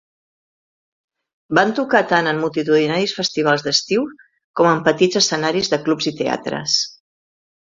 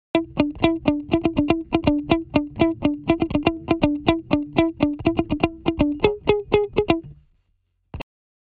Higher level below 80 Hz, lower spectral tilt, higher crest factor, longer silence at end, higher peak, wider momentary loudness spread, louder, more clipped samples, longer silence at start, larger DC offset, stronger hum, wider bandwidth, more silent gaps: second, -60 dBFS vs -40 dBFS; second, -3.5 dB/octave vs -9 dB/octave; about the same, 20 dB vs 22 dB; first, 0.8 s vs 0.5 s; about the same, 0 dBFS vs 0 dBFS; about the same, 6 LU vs 4 LU; first, -18 LUFS vs -22 LUFS; neither; first, 1.5 s vs 0.15 s; neither; neither; first, 7.8 kHz vs 4.9 kHz; first, 4.44-4.54 s vs none